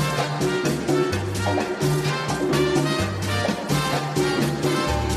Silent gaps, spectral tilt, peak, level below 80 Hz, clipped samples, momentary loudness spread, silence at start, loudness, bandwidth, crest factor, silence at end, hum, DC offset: none; -5 dB/octave; -8 dBFS; -40 dBFS; under 0.1%; 3 LU; 0 s; -23 LUFS; 15 kHz; 14 dB; 0 s; none; under 0.1%